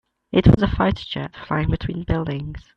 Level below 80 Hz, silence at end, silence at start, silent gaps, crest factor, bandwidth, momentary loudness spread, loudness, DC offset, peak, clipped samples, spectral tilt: -32 dBFS; 0.15 s; 0.35 s; none; 20 dB; 6.6 kHz; 13 LU; -21 LUFS; under 0.1%; 0 dBFS; under 0.1%; -9 dB/octave